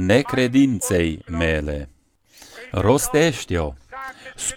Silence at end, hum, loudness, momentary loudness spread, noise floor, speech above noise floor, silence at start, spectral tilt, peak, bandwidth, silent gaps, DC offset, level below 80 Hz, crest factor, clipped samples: 0 s; none; -20 LUFS; 17 LU; -53 dBFS; 34 dB; 0 s; -5 dB/octave; -4 dBFS; 19 kHz; none; under 0.1%; -38 dBFS; 18 dB; under 0.1%